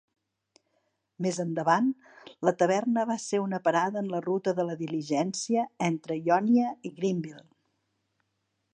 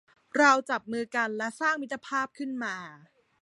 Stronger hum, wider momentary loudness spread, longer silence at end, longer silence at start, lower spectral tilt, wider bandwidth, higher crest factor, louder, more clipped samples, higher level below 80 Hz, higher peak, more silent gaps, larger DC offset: neither; second, 7 LU vs 12 LU; first, 1.35 s vs 0.45 s; first, 1.2 s vs 0.35 s; first, -5.5 dB/octave vs -3 dB/octave; second, 9.6 kHz vs 11.5 kHz; about the same, 20 dB vs 22 dB; about the same, -28 LUFS vs -28 LUFS; neither; about the same, -80 dBFS vs -78 dBFS; about the same, -8 dBFS vs -8 dBFS; neither; neither